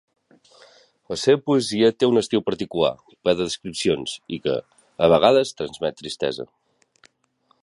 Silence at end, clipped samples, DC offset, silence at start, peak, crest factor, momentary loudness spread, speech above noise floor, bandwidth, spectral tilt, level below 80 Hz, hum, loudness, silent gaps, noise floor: 1.2 s; under 0.1%; under 0.1%; 1.1 s; -2 dBFS; 20 dB; 11 LU; 44 dB; 11.5 kHz; -5 dB/octave; -56 dBFS; none; -22 LUFS; none; -65 dBFS